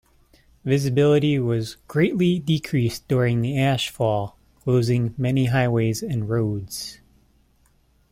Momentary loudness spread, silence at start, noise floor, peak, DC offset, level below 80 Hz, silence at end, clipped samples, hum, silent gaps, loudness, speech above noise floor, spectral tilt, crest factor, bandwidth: 9 LU; 0.65 s; -61 dBFS; -8 dBFS; under 0.1%; -50 dBFS; 1.2 s; under 0.1%; none; none; -22 LUFS; 40 dB; -6.5 dB/octave; 14 dB; 16 kHz